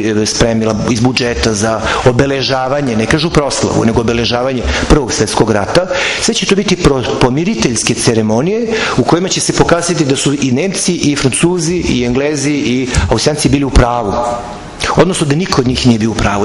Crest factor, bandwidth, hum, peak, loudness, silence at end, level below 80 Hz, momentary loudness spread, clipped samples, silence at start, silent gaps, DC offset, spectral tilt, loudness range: 12 dB; 12 kHz; none; 0 dBFS; -12 LUFS; 0 s; -26 dBFS; 3 LU; 0.2%; 0 s; none; under 0.1%; -4.5 dB/octave; 1 LU